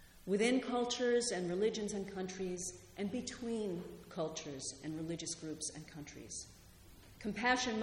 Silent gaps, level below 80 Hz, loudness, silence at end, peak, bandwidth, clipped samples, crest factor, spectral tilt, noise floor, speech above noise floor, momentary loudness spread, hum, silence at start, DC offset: none; -64 dBFS; -38 LUFS; 0 s; -20 dBFS; 16.5 kHz; under 0.1%; 20 dB; -3.5 dB/octave; -59 dBFS; 21 dB; 13 LU; none; 0 s; under 0.1%